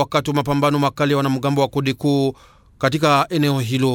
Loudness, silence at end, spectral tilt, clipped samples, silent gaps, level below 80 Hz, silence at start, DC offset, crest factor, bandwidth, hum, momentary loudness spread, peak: -19 LUFS; 0 s; -6 dB/octave; under 0.1%; none; -50 dBFS; 0 s; under 0.1%; 16 dB; 17.5 kHz; none; 4 LU; -4 dBFS